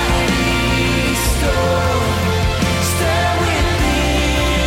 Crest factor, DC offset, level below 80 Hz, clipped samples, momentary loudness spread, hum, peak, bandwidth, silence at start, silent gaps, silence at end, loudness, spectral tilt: 10 dB; under 0.1%; -22 dBFS; under 0.1%; 1 LU; none; -6 dBFS; 16.5 kHz; 0 s; none; 0 s; -16 LUFS; -4.5 dB/octave